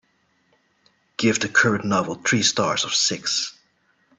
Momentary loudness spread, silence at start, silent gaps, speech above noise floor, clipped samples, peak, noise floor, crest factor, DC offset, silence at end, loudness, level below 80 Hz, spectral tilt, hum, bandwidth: 6 LU; 1.2 s; none; 44 dB; under 0.1%; -4 dBFS; -66 dBFS; 20 dB; under 0.1%; 0.65 s; -20 LUFS; -62 dBFS; -2.5 dB/octave; none; 8.8 kHz